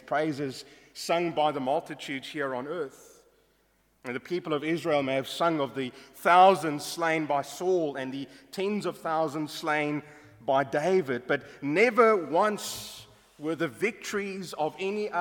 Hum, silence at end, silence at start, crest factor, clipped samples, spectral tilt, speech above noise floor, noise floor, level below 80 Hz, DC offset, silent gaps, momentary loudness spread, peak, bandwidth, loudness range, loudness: none; 0 s; 0.05 s; 20 dB; under 0.1%; -4.5 dB/octave; 40 dB; -68 dBFS; -72 dBFS; under 0.1%; none; 15 LU; -8 dBFS; 18.5 kHz; 7 LU; -28 LUFS